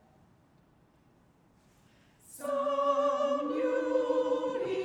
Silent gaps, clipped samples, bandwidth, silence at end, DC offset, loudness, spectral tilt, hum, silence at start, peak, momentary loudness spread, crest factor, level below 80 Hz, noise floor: none; under 0.1%; 15 kHz; 0 s; under 0.1%; -30 LUFS; -4.5 dB/octave; none; 2.3 s; -16 dBFS; 6 LU; 16 dB; -74 dBFS; -64 dBFS